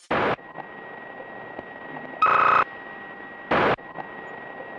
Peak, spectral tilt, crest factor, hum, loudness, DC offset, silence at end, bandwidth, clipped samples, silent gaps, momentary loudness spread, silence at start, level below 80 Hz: -10 dBFS; -6 dB/octave; 16 dB; none; -22 LUFS; under 0.1%; 0 s; 10 kHz; under 0.1%; none; 20 LU; 0.1 s; -60 dBFS